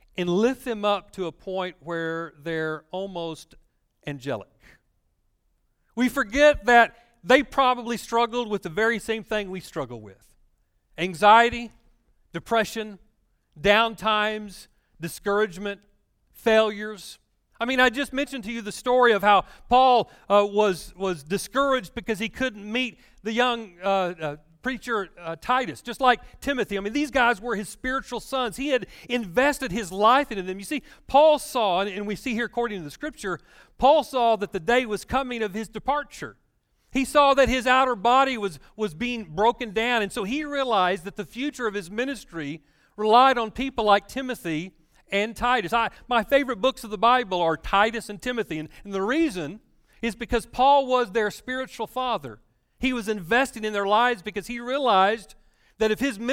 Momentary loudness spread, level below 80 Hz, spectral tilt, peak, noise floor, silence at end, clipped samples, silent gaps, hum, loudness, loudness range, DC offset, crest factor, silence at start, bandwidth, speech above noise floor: 14 LU; -50 dBFS; -4 dB/octave; -4 dBFS; -69 dBFS; 0 s; under 0.1%; none; none; -24 LUFS; 6 LU; under 0.1%; 20 dB; 0.2 s; 16.5 kHz; 46 dB